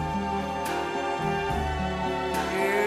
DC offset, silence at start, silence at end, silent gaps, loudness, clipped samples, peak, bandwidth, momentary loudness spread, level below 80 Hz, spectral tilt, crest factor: under 0.1%; 0 s; 0 s; none; -28 LUFS; under 0.1%; -14 dBFS; 16 kHz; 3 LU; -40 dBFS; -5 dB/octave; 14 dB